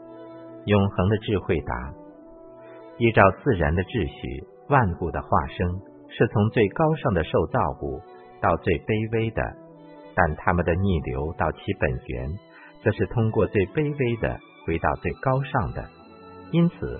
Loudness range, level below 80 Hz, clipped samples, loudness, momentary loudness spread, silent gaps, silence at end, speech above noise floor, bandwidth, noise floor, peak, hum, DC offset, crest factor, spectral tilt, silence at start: 3 LU; -42 dBFS; under 0.1%; -24 LUFS; 15 LU; none; 0 s; 22 dB; 4.3 kHz; -45 dBFS; -2 dBFS; none; under 0.1%; 22 dB; -12 dB/octave; 0 s